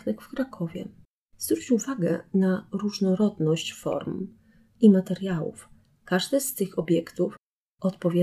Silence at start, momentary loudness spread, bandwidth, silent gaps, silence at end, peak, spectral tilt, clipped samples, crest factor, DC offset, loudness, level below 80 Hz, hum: 0.05 s; 12 LU; 15 kHz; 1.05-1.28 s, 7.39-7.78 s; 0 s; -6 dBFS; -6 dB/octave; under 0.1%; 20 dB; under 0.1%; -26 LUFS; -64 dBFS; none